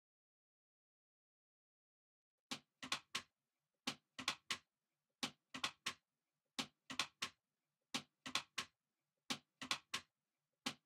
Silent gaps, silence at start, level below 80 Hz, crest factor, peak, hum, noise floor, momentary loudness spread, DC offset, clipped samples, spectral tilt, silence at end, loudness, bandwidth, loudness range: none; 2.5 s; -88 dBFS; 30 dB; -22 dBFS; none; under -90 dBFS; 6 LU; under 0.1%; under 0.1%; -0.5 dB/octave; 0.1 s; -47 LUFS; 16 kHz; 5 LU